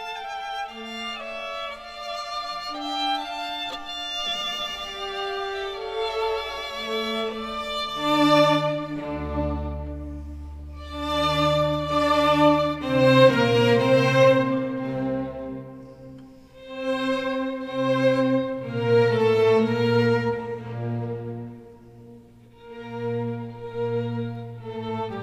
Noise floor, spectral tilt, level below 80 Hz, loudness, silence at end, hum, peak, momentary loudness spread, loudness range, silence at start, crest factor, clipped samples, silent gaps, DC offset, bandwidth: -49 dBFS; -6 dB/octave; -44 dBFS; -24 LUFS; 0 s; none; -2 dBFS; 17 LU; 11 LU; 0 s; 22 dB; under 0.1%; none; under 0.1%; 15 kHz